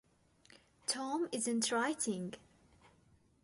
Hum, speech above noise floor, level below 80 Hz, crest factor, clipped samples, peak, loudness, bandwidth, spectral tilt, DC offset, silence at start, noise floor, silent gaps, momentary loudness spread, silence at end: none; 32 dB; -76 dBFS; 18 dB; under 0.1%; -22 dBFS; -37 LUFS; 12 kHz; -2.5 dB/octave; under 0.1%; 0.9 s; -69 dBFS; none; 10 LU; 1.05 s